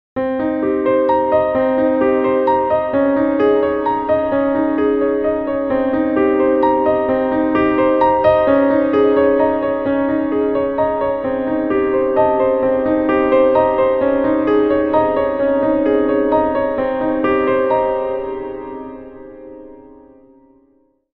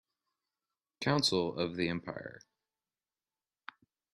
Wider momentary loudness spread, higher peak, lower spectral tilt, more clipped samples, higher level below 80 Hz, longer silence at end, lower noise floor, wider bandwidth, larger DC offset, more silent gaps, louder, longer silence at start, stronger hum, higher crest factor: second, 6 LU vs 24 LU; first, -2 dBFS vs -14 dBFS; first, -9.5 dB/octave vs -4.5 dB/octave; neither; first, -44 dBFS vs -70 dBFS; second, 1.35 s vs 1.75 s; second, -57 dBFS vs under -90 dBFS; second, 4.7 kHz vs 11.5 kHz; neither; neither; first, -16 LUFS vs -33 LUFS; second, 0.15 s vs 1 s; neither; second, 14 dB vs 24 dB